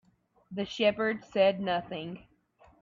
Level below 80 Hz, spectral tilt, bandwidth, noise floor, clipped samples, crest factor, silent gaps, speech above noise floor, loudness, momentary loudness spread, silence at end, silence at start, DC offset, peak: -68 dBFS; -5.5 dB/octave; 7.4 kHz; -62 dBFS; under 0.1%; 18 dB; none; 33 dB; -30 LUFS; 16 LU; 0.6 s; 0.5 s; under 0.1%; -12 dBFS